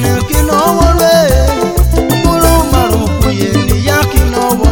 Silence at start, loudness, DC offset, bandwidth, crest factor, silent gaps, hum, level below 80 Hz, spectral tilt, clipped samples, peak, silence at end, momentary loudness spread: 0 s; -10 LUFS; 0.6%; over 20 kHz; 10 dB; none; none; -14 dBFS; -5.5 dB/octave; 0.4%; 0 dBFS; 0 s; 4 LU